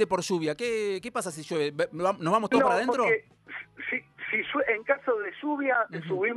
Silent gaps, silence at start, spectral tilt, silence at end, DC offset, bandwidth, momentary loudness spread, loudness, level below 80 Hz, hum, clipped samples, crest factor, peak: none; 0 s; -4.5 dB/octave; 0 s; under 0.1%; 13 kHz; 9 LU; -28 LUFS; -68 dBFS; none; under 0.1%; 20 dB; -8 dBFS